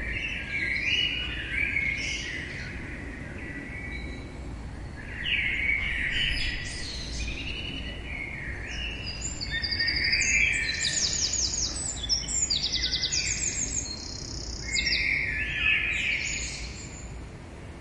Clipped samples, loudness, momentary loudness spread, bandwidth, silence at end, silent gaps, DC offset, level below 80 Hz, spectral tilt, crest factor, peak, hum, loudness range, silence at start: under 0.1%; -27 LUFS; 15 LU; 11.5 kHz; 0 s; none; under 0.1%; -40 dBFS; -1 dB/octave; 18 dB; -12 dBFS; none; 8 LU; 0 s